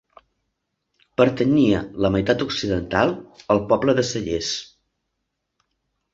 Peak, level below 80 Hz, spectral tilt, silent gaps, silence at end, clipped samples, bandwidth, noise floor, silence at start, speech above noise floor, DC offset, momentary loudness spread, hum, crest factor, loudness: -2 dBFS; -46 dBFS; -5.5 dB/octave; none; 1.5 s; under 0.1%; 7.8 kHz; -78 dBFS; 1.2 s; 57 dB; under 0.1%; 8 LU; none; 20 dB; -21 LUFS